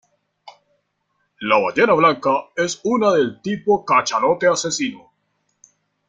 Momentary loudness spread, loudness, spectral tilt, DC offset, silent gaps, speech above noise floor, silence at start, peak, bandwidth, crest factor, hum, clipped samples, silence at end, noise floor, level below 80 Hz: 8 LU; -18 LUFS; -4 dB/octave; under 0.1%; none; 52 dB; 0.45 s; -2 dBFS; 9.4 kHz; 18 dB; none; under 0.1%; 1.1 s; -70 dBFS; -62 dBFS